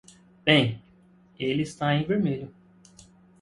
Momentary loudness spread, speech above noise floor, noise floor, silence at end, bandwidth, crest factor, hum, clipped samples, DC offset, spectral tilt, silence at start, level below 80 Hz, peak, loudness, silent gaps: 14 LU; 33 dB; -57 dBFS; 0.95 s; 11.5 kHz; 24 dB; none; under 0.1%; under 0.1%; -6 dB/octave; 0.45 s; -60 dBFS; -4 dBFS; -25 LUFS; none